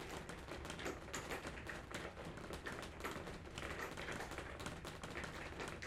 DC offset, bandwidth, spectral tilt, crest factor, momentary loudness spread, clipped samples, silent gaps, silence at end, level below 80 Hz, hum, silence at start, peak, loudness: under 0.1%; 16 kHz; -4 dB/octave; 22 dB; 4 LU; under 0.1%; none; 0 s; -58 dBFS; none; 0 s; -26 dBFS; -48 LUFS